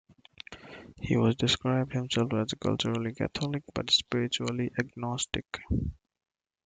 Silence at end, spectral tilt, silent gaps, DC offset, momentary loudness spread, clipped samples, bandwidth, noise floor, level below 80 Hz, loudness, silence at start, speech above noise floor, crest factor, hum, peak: 0.7 s; -5 dB/octave; none; under 0.1%; 17 LU; under 0.1%; 9.4 kHz; -50 dBFS; -50 dBFS; -30 LUFS; 0.5 s; 20 dB; 20 dB; none; -10 dBFS